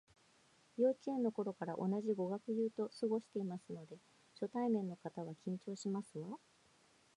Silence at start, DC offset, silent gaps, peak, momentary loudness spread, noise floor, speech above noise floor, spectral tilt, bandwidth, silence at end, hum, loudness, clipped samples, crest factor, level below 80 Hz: 0.8 s; under 0.1%; none; -24 dBFS; 14 LU; -71 dBFS; 31 dB; -7.5 dB/octave; 11 kHz; 0.8 s; none; -41 LUFS; under 0.1%; 18 dB; -88 dBFS